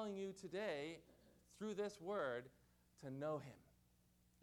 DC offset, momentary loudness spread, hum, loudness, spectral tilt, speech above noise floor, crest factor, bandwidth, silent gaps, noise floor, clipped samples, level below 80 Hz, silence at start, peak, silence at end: under 0.1%; 15 LU; 60 Hz at -75 dBFS; -48 LUFS; -5.5 dB/octave; 28 dB; 16 dB; 18.5 kHz; none; -76 dBFS; under 0.1%; -80 dBFS; 0 s; -32 dBFS; 0.75 s